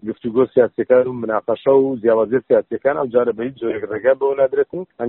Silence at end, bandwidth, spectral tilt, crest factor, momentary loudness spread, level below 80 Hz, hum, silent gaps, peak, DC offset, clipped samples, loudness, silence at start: 0 s; 4 kHz; -6 dB/octave; 16 dB; 7 LU; -60 dBFS; none; none; -2 dBFS; under 0.1%; under 0.1%; -18 LUFS; 0.05 s